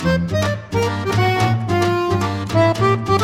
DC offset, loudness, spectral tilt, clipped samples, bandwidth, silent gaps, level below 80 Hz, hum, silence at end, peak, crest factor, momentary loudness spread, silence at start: under 0.1%; -18 LUFS; -6.5 dB/octave; under 0.1%; 15.5 kHz; none; -42 dBFS; none; 0 s; -4 dBFS; 14 dB; 5 LU; 0 s